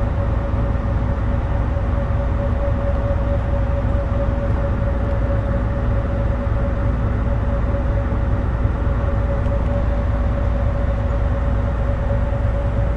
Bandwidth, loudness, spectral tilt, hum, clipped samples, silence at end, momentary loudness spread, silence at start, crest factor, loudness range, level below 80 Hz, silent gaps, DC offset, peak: 4.2 kHz; -21 LUFS; -9.5 dB/octave; none; under 0.1%; 0 s; 1 LU; 0 s; 12 dB; 0 LU; -20 dBFS; none; under 0.1%; -6 dBFS